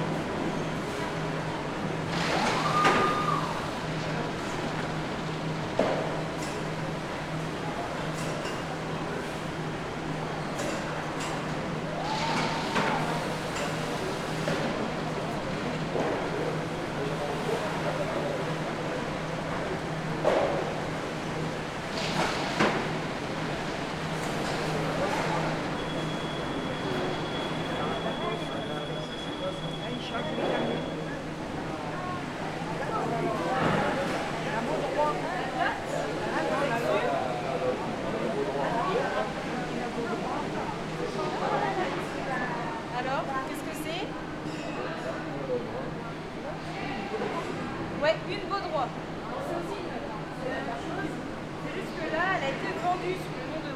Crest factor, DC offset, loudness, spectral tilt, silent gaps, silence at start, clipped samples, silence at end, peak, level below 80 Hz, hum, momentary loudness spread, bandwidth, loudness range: 20 dB; under 0.1%; -31 LUFS; -5 dB/octave; none; 0 s; under 0.1%; 0 s; -10 dBFS; -52 dBFS; none; 7 LU; 15.5 kHz; 5 LU